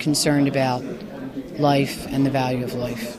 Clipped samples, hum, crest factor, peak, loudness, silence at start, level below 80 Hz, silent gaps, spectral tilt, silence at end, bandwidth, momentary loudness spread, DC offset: under 0.1%; none; 16 dB; -6 dBFS; -22 LUFS; 0 s; -50 dBFS; none; -5 dB/octave; 0 s; 15 kHz; 14 LU; under 0.1%